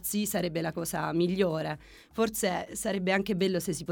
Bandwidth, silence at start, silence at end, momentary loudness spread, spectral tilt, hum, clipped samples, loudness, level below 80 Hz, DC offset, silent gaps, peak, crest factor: over 20 kHz; 0 s; 0 s; 6 LU; -4.5 dB/octave; none; under 0.1%; -30 LUFS; -58 dBFS; under 0.1%; none; -12 dBFS; 18 dB